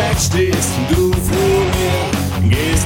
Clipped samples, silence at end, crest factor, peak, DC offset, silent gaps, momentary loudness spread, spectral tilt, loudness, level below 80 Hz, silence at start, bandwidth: under 0.1%; 0 s; 12 dB; -2 dBFS; under 0.1%; none; 2 LU; -5 dB/octave; -15 LUFS; -26 dBFS; 0 s; 18 kHz